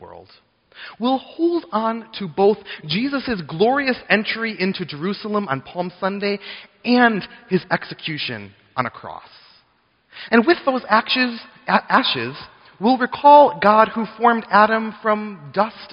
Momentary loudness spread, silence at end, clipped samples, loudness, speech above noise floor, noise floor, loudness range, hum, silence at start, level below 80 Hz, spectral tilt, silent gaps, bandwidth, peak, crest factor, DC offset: 13 LU; 0 s; under 0.1%; -19 LUFS; 43 dB; -62 dBFS; 7 LU; none; 0 s; -60 dBFS; -2.5 dB/octave; none; 5.6 kHz; 0 dBFS; 20 dB; under 0.1%